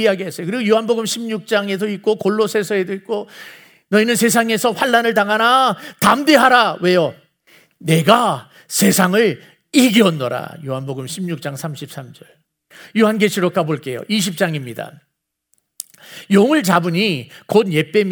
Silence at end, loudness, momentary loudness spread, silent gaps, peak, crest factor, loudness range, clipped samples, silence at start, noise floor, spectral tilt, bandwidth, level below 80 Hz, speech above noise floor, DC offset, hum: 0 s; -16 LUFS; 15 LU; none; 0 dBFS; 18 dB; 7 LU; under 0.1%; 0 s; -67 dBFS; -4.5 dB/octave; over 20 kHz; -64 dBFS; 50 dB; under 0.1%; none